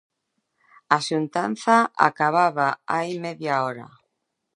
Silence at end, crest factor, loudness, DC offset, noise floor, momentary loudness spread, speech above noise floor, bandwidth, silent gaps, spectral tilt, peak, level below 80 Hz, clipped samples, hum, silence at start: 0.7 s; 22 dB; -22 LUFS; under 0.1%; -78 dBFS; 10 LU; 55 dB; 11.5 kHz; none; -5 dB/octave; -2 dBFS; -76 dBFS; under 0.1%; none; 0.9 s